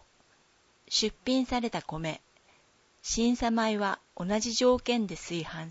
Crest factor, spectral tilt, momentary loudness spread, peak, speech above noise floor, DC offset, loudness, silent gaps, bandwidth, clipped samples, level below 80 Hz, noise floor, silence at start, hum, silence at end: 18 dB; -3.5 dB/octave; 10 LU; -14 dBFS; 36 dB; under 0.1%; -29 LUFS; none; 8 kHz; under 0.1%; -52 dBFS; -65 dBFS; 0.9 s; none; 0 s